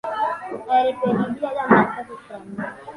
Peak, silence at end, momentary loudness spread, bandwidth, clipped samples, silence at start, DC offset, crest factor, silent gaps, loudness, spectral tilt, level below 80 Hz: 0 dBFS; 0 s; 17 LU; 11.5 kHz; under 0.1%; 0.05 s; under 0.1%; 22 dB; none; -21 LUFS; -7.5 dB/octave; -60 dBFS